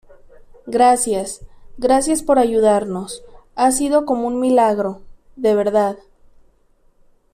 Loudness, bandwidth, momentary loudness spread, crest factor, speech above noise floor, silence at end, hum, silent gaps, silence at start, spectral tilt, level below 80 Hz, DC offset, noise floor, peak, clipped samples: -17 LUFS; 15 kHz; 17 LU; 16 dB; 39 dB; 1.35 s; none; none; 0.65 s; -4.5 dB/octave; -46 dBFS; under 0.1%; -56 dBFS; -4 dBFS; under 0.1%